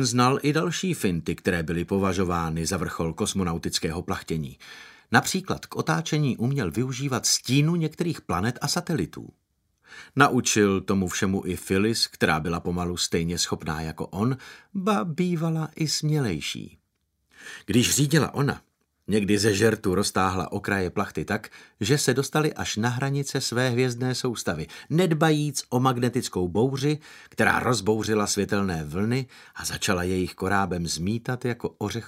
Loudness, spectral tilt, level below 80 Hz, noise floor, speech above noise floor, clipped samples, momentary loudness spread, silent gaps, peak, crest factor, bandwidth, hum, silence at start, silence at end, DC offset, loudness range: -25 LUFS; -4.5 dB/octave; -52 dBFS; -74 dBFS; 49 dB; under 0.1%; 10 LU; none; -2 dBFS; 24 dB; 16 kHz; none; 0 s; 0 s; under 0.1%; 3 LU